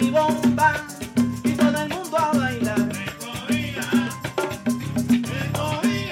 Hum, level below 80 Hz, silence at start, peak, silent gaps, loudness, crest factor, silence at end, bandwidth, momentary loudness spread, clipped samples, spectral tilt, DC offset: none; -48 dBFS; 0 s; -6 dBFS; none; -23 LUFS; 16 dB; 0 s; 16.5 kHz; 7 LU; under 0.1%; -5 dB/octave; under 0.1%